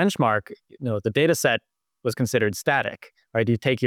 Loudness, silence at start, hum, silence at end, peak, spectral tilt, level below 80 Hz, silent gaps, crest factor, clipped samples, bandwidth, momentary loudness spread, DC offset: -24 LUFS; 0 s; none; 0 s; -8 dBFS; -5 dB/octave; -64 dBFS; none; 16 dB; under 0.1%; 19.5 kHz; 10 LU; under 0.1%